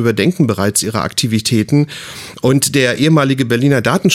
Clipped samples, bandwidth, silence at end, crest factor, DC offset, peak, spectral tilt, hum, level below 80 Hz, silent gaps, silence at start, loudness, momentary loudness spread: under 0.1%; 17 kHz; 0 s; 12 dB; under 0.1%; -2 dBFS; -5 dB/octave; none; -50 dBFS; none; 0 s; -14 LUFS; 5 LU